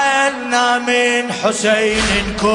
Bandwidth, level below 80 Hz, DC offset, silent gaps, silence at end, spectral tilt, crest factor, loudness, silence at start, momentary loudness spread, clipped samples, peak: 11 kHz; -36 dBFS; under 0.1%; none; 0 s; -3 dB/octave; 14 dB; -15 LUFS; 0 s; 2 LU; under 0.1%; -2 dBFS